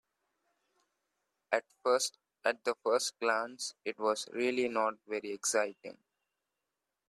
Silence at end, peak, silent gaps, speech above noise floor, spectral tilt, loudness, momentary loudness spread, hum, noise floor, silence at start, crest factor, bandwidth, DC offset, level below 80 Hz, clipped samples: 1.15 s; -14 dBFS; none; 54 dB; -1.5 dB/octave; -34 LUFS; 8 LU; none; -88 dBFS; 1.5 s; 22 dB; 13.5 kHz; under 0.1%; -84 dBFS; under 0.1%